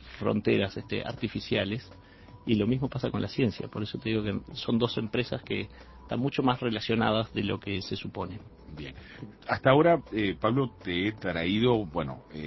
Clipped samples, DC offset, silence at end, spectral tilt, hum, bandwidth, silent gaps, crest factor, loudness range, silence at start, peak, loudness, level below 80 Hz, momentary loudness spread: under 0.1%; under 0.1%; 0 s; -7.5 dB/octave; none; 6 kHz; none; 22 dB; 4 LU; 0 s; -6 dBFS; -29 LUFS; -52 dBFS; 13 LU